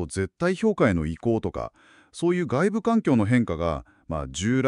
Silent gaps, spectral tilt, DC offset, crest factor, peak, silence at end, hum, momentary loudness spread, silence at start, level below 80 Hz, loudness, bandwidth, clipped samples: none; -6.5 dB/octave; under 0.1%; 16 dB; -8 dBFS; 0 s; none; 12 LU; 0 s; -44 dBFS; -25 LUFS; 11.5 kHz; under 0.1%